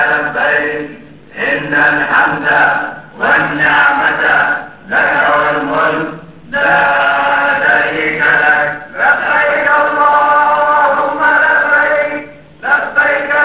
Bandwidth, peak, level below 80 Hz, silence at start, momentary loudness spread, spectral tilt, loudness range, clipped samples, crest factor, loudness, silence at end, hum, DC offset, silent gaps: 4 kHz; 0 dBFS; -48 dBFS; 0 s; 9 LU; -7.5 dB/octave; 2 LU; under 0.1%; 12 dB; -11 LUFS; 0 s; none; 0.5%; none